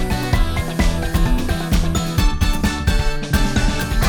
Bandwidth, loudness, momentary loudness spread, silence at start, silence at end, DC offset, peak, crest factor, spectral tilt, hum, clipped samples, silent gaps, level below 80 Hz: over 20 kHz; -20 LUFS; 2 LU; 0 s; 0 s; under 0.1%; -2 dBFS; 14 dB; -5 dB/octave; none; under 0.1%; none; -20 dBFS